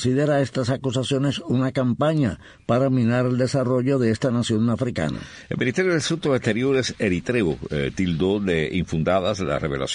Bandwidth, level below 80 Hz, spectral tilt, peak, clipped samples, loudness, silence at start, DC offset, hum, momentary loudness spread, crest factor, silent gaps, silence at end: 10 kHz; -46 dBFS; -6 dB/octave; -8 dBFS; under 0.1%; -22 LUFS; 0 s; under 0.1%; none; 5 LU; 14 dB; none; 0 s